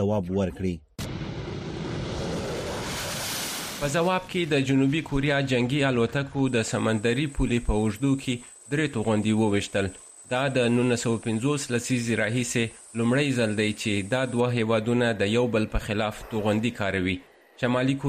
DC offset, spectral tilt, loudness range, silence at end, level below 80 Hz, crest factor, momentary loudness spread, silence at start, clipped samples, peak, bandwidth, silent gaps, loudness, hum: under 0.1%; -5.5 dB/octave; 4 LU; 0 s; -42 dBFS; 14 dB; 9 LU; 0 s; under 0.1%; -12 dBFS; 15.5 kHz; none; -26 LUFS; none